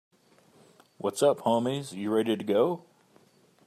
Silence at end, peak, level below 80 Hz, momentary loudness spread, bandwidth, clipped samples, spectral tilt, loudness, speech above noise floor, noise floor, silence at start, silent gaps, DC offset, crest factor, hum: 0.85 s; -12 dBFS; -78 dBFS; 9 LU; 14 kHz; under 0.1%; -5.5 dB/octave; -28 LUFS; 35 dB; -62 dBFS; 1.05 s; none; under 0.1%; 18 dB; none